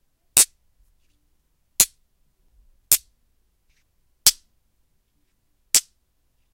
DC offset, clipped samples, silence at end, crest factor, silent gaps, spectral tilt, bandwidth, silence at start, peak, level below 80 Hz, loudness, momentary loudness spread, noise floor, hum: under 0.1%; under 0.1%; 0.75 s; 26 dB; none; 2 dB/octave; 16 kHz; 0.35 s; 0 dBFS; -56 dBFS; -19 LUFS; 3 LU; -68 dBFS; none